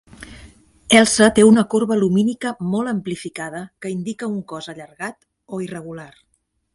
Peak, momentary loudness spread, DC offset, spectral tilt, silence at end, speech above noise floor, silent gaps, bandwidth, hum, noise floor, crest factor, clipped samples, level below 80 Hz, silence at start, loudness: 0 dBFS; 21 LU; under 0.1%; -4.5 dB/octave; 0.7 s; 50 dB; none; 11.5 kHz; none; -69 dBFS; 20 dB; under 0.1%; -52 dBFS; 0.2 s; -18 LUFS